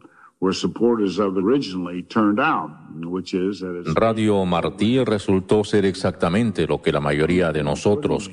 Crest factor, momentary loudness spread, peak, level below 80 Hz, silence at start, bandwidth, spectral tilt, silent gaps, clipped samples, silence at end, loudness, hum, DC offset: 16 dB; 7 LU; -4 dBFS; -48 dBFS; 0.4 s; 11 kHz; -6.5 dB/octave; none; under 0.1%; 0 s; -21 LUFS; none; under 0.1%